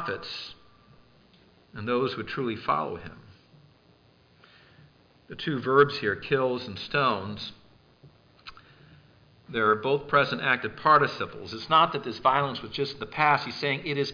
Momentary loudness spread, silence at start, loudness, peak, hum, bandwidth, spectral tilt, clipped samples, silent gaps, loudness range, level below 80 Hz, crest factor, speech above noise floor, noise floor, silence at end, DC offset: 17 LU; 0 s; -26 LUFS; -8 dBFS; none; 5.2 kHz; -6 dB/octave; under 0.1%; none; 8 LU; -62 dBFS; 20 dB; 33 dB; -60 dBFS; 0 s; under 0.1%